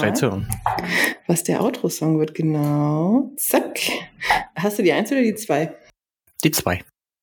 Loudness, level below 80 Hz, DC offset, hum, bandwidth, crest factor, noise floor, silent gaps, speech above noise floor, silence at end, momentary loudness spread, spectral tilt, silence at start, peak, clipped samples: -21 LUFS; -48 dBFS; under 0.1%; none; 19 kHz; 20 dB; -62 dBFS; none; 42 dB; 0.4 s; 5 LU; -4.5 dB/octave; 0 s; -2 dBFS; under 0.1%